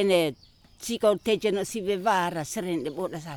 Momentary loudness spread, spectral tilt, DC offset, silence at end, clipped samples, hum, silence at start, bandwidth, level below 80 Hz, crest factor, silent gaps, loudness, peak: 9 LU; -4.5 dB/octave; under 0.1%; 0 s; under 0.1%; none; 0 s; over 20 kHz; -60 dBFS; 16 dB; none; -27 LUFS; -10 dBFS